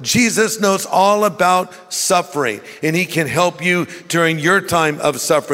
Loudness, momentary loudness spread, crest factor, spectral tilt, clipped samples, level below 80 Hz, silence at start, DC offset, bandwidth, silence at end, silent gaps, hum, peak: -16 LUFS; 6 LU; 14 dB; -3.5 dB/octave; under 0.1%; -54 dBFS; 0 s; under 0.1%; 16.5 kHz; 0 s; none; none; -2 dBFS